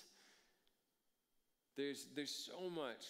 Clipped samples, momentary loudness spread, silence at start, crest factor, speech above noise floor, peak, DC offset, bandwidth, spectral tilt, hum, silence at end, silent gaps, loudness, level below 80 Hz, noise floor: under 0.1%; 8 LU; 0 s; 18 dB; 39 dB; -32 dBFS; under 0.1%; 16 kHz; -3 dB/octave; none; 0 s; none; -47 LUFS; under -90 dBFS; -86 dBFS